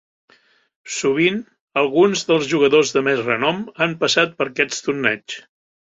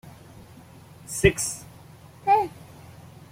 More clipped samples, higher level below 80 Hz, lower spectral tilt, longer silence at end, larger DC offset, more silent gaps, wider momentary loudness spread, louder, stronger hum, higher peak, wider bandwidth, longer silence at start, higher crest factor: neither; second, -62 dBFS vs -46 dBFS; about the same, -3.5 dB/octave vs -4 dB/octave; first, 0.55 s vs 0.25 s; neither; first, 1.61-1.68 s vs none; second, 10 LU vs 25 LU; first, -18 LUFS vs -24 LUFS; neither; about the same, -2 dBFS vs -2 dBFS; second, 8 kHz vs 16.5 kHz; first, 0.85 s vs 0.05 s; second, 18 dB vs 26 dB